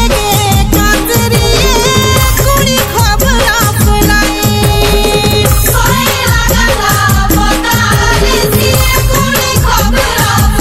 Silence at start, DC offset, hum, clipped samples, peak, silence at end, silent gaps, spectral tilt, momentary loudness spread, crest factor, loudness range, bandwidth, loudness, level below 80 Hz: 0 s; under 0.1%; none; 0.3%; 0 dBFS; 0 s; none; -4 dB/octave; 1 LU; 8 dB; 0 LU; 16.5 kHz; -9 LUFS; -14 dBFS